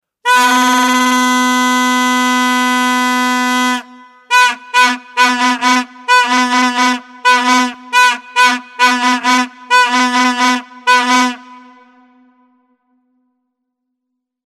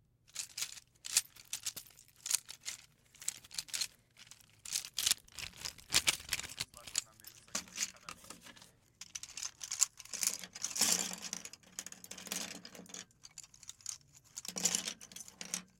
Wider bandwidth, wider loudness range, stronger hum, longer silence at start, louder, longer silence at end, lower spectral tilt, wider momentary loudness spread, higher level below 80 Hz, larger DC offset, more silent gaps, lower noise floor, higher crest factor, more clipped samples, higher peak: about the same, 15.5 kHz vs 17 kHz; about the same, 4 LU vs 6 LU; neither; about the same, 0.25 s vs 0.35 s; first, -12 LUFS vs -37 LUFS; first, 2.85 s vs 0.15 s; about the same, 0 dB/octave vs 0.5 dB/octave; second, 4 LU vs 18 LU; about the same, -66 dBFS vs -70 dBFS; neither; neither; first, -75 dBFS vs -62 dBFS; second, 14 dB vs 32 dB; neither; first, 0 dBFS vs -10 dBFS